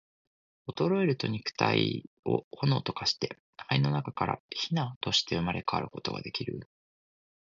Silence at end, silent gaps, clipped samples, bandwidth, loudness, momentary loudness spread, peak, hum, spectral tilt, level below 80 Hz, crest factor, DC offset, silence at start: 0.85 s; 2.07-2.23 s, 2.44-2.51 s, 3.40-3.53 s, 4.40-4.49 s, 4.96-5.01 s; under 0.1%; 7.6 kHz; -30 LUFS; 10 LU; -8 dBFS; none; -5.5 dB/octave; -60 dBFS; 22 dB; under 0.1%; 0.65 s